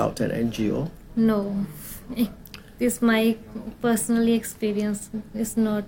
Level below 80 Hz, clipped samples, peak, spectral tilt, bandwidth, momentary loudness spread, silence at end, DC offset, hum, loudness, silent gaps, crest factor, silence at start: -48 dBFS; under 0.1%; -8 dBFS; -5 dB/octave; 17.5 kHz; 12 LU; 0 s; under 0.1%; none; -25 LUFS; none; 16 dB; 0 s